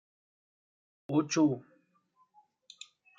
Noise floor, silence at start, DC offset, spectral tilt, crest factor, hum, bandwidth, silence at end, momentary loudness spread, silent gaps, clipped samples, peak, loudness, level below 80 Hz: -71 dBFS; 1.1 s; under 0.1%; -5.5 dB/octave; 20 dB; none; 7.6 kHz; 1.6 s; 23 LU; none; under 0.1%; -16 dBFS; -30 LUFS; -82 dBFS